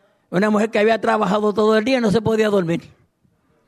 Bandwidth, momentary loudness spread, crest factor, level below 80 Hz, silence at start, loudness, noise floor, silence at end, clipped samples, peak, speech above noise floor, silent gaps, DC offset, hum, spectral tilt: 13 kHz; 5 LU; 12 dB; -54 dBFS; 0.3 s; -18 LUFS; -62 dBFS; 0.8 s; under 0.1%; -6 dBFS; 45 dB; none; under 0.1%; none; -6 dB/octave